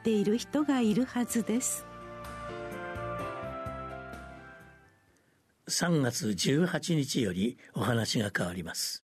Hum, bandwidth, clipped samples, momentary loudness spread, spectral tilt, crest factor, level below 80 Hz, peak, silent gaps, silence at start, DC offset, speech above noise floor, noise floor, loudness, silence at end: none; 13.5 kHz; under 0.1%; 16 LU; -4.5 dB/octave; 18 dB; -58 dBFS; -14 dBFS; none; 0 s; under 0.1%; 39 dB; -69 dBFS; -31 LUFS; 0.2 s